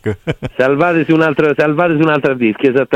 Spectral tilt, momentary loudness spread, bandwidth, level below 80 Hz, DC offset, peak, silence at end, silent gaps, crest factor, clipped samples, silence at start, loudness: -8 dB/octave; 6 LU; 8.2 kHz; -44 dBFS; under 0.1%; 0 dBFS; 0 s; none; 12 dB; under 0.1%; 0.05 s; -13 LUFS